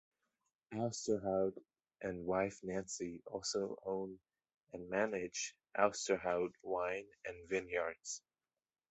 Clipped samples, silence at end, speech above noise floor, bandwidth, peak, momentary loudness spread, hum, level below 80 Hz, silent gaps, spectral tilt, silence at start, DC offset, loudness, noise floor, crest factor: under 0.1%; 0.7 s; over 50 dB; 8.2 kHz; -16 dBFS; 13 LU; none; -72 dBFS; 4.57-4.61 s; -4 dB/octave; 0.7 s; under 0.1%; -40 LUFS; under -90 dBFS; 24 dB